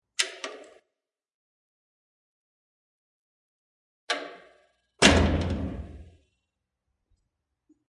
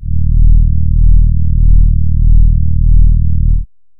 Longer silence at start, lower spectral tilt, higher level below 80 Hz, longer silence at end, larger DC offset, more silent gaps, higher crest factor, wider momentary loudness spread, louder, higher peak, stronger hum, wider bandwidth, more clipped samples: first, 0.2 s vs 0 s; second, -3.5 dB/octave vs -18 dB/octave; second, -42 dBFS vs -8 dBFS; first, 1.85 s vs 0.35 s; neither; first, 1.34-4.08 s vs none; first, 30 dB vs 6 dB; first, 22 LU vs 3 LU; second, -25 LUFS vs -13 LUFS; about the same, -2 dBFS vs 0 dBFS; neither; first, 11.5 kHz vs 0.4 kHz; neither